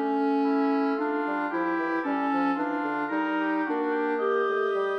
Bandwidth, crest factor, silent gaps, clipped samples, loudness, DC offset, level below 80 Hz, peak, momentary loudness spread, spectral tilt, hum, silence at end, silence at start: 6 kHz; 12 dB; none; under 0.1%; -27 LUFS; under 0.1%; -78 dBFS; -14 dBFS; 3 LU; -6.5 dB/octave; none; 0 s; 0 s